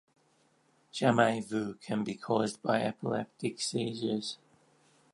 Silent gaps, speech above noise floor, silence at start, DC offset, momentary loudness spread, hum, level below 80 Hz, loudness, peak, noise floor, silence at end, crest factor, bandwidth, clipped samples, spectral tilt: none; 38 dB; 0.95 s; under 0.1%; 9 LU; none; -74 dBFS; -32 LUFS; -10 dBFS; -69 dBFS; 0.8 s; 22 dB; 11.5 kHz; under 0.1%; -5 dB/octave